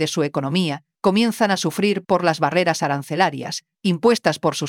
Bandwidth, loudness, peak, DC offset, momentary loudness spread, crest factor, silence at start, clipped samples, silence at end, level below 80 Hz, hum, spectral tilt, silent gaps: 17 kHz; -20 LUFS; -4 dBFS; under 0.1%; 6 LU; 16 dB; 0 s; under 0.1%; 0 s; -66 dBFS; none; -5 dB/octave; none